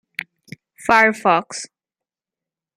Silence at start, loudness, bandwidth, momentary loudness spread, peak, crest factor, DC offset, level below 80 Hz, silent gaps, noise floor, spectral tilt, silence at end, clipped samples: 0.8 s; -16 LUFS; 15.5 kHz; 21 LU; -2 dBFS; 20 dB; under 0.1%; -58 dBFS; none; -89 dBFS; -3.5 dB/octave; 1.1 s; under 0.1%